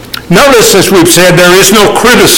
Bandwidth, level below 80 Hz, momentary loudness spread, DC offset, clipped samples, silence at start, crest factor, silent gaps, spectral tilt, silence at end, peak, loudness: over 20 kHz; -28 dBFS; 2 LU; under 0.1%; 4%; 0 s; 4 dB; none; -3 dB/octave; 0 s; 0 dBFS; -3 LUFS